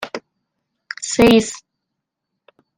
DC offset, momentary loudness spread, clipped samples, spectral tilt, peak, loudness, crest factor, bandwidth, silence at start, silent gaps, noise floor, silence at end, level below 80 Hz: under 0.1%; 21 LU; under 0.1%; -4 dB/octave; -2 dBFS; -15 LUFS; 20 dB; 16 kHz; 0 s; none; -79 dBFS; 1.2 s; -46 dBFS